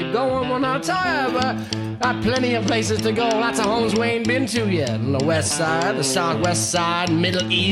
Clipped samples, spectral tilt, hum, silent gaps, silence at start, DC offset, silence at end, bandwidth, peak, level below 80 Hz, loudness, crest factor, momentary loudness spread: under 0.1%; -4 dB/octave; none; none; 0 s; under 0.1%; 0 s; 14 kHz; -4 dBFS; -50 dBFS; -20 LUFS; 16 dB; 2 LU